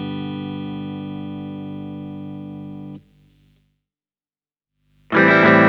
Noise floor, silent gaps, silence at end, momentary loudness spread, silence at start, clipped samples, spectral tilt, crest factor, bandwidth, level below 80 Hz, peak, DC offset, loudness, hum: under -90 dBFS; none; 0 s; 21 LU; 0 s; under 0.1%; -8 dB/octave; 20 dB; 6.8 kHz; -62 dBFS; 0 dBFS; under 0.1%; -20 LUFS; none